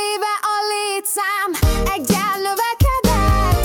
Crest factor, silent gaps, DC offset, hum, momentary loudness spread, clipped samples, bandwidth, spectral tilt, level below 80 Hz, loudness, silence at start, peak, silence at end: 12 dB; none; under 0.1%; none; 4 LU; under 0.1%; 18 kHz; -4.5 dB/octave; -24 dBFS; -18 LUFS; 0 s; -6 dBFS; 0 s